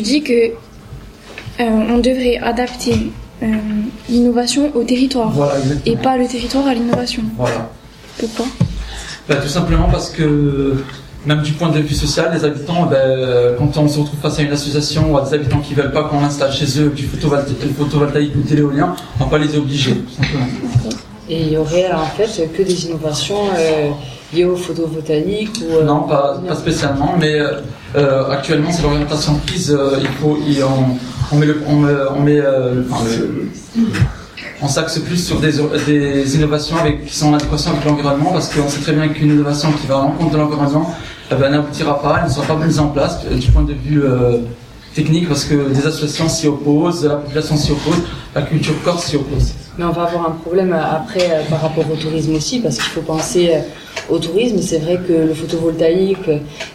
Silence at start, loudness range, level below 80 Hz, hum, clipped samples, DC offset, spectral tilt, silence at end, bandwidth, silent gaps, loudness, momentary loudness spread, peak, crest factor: 0 s; 3 LU; -30 dBFS; none; under 0.1%; under 0.1%; -6 dB/octave; 0 s; 14.5 kHz; none; -16 LUFS; 6 LU; 0 dBFS; 14 dB